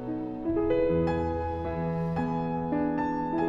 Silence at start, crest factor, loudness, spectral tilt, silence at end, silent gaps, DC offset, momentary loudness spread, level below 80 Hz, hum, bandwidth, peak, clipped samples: 0 s; 14 dB; -29 LUFS; -9.5 dB/octave; 0 s; none; under 0.1%; 6 LU; -46 dBFS; none; 7.4 kHz; -14 dBFS; under 0.1%